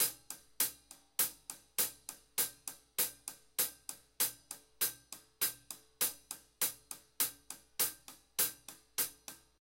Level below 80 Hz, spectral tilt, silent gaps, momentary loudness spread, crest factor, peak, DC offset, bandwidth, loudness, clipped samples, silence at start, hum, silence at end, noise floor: -76 dBFS; 1 dB/octave; none; 16 LU; 26 dB; -14 dBFS; under 0.1%; 17 kHz; -36 LUFS; under 0.1%; 0 s; none; 0.25 s; -58 dBFS